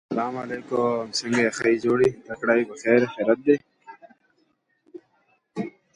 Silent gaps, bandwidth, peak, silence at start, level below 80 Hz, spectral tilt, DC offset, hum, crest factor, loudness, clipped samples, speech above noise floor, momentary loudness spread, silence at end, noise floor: none; 11 kHz; -4 dBFS; 0.1 s; -64 dBFS; -5 dB/octave; under 0.1%; none; 20 dB; -23 LUFS; under 0.1%; 46 dB; 12 LU; 0.25 s; -68 dBFS